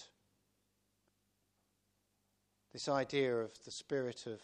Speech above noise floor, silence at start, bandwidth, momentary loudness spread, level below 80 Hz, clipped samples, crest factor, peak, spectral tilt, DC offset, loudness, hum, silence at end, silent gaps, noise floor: 42 dB; 0 s; 10.5 kHz; 12 LU; -82 dBFS; under 0.1%; 22 dB; -22 dBFS; -4.5 dB/octave; under 0.1%; -38 LUFS; 50 Hz at -85 dBFS; 0 s; none; -81 dBFS